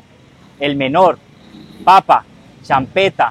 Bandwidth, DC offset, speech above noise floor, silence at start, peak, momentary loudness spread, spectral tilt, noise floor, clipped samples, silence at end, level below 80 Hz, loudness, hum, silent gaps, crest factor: 13.5 kHz; under 0.1%; 32 dB; 0.6 s; 0 dBFS; 10 LU; -5.5 dB/octave; -45 dBFS; under 0.1%; 0 s; -52 dBFS; -14 LUFS; none; none; 14 dB